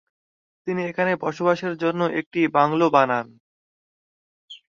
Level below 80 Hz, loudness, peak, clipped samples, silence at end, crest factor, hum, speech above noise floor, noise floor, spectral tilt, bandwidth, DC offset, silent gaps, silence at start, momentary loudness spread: -68 dBFS; -22 LUFS; -2 dBFS; under 0.1%; 0.2 s; 22 dB; none; over 69 dB; under -90 dBFS; -7 dB/octave; 7.2 kHz; under 0.1%; 2.26-2.31 s, 3.40-4.48 s; 0.65 s; 10 LU